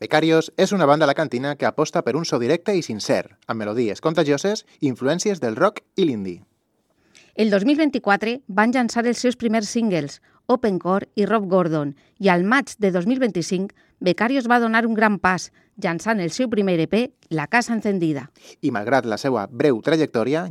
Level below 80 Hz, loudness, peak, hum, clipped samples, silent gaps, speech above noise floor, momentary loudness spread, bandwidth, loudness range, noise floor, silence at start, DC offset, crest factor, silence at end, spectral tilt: -64 dBFS; -21 LUFS; 0 dBFS; none; under 0.1%; none; 47 dB; 8 LU; 13.5 kHz; 2 LU; -67 dBFS; 0 s; under 0.1%; 20 dB; 0 s; -5.5 dB/octave